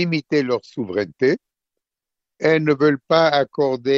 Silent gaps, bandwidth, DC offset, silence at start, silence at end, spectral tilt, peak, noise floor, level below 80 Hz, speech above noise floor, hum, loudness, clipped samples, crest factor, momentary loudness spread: none; 7.4 kHz; under 0.1%; 0 s; 0 s; -6.5 dB/octave; -2 dBFS; -85 dBFS; -62 dBFS; 67 dB; none; -19 LUFS; under 0.1%; 18 dB; 8 LU